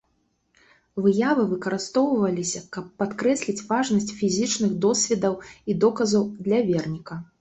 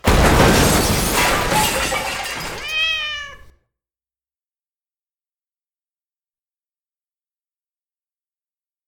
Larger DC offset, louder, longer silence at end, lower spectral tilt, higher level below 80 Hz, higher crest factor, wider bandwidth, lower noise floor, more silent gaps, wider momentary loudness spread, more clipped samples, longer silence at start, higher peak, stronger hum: neither; second, -23 LUFS vs -17 LUFS; second, 0.15 s vs 5.5 s; about the same, -4.5 dB/octave vs -3.5 dB/octave; second, -60 dBFS vs -30 dBFS; about the same, 16 dB vs 20 dB; second, 8.4 kHz vs 19.5 kHz; second, -70 dBFS vs under -90 dBFS; neither; about the same, 10 LU vs 12 LU; neither; first, 0.95 s vs 0.05 s; second, -8 dBFS vs 0 dBFS; neither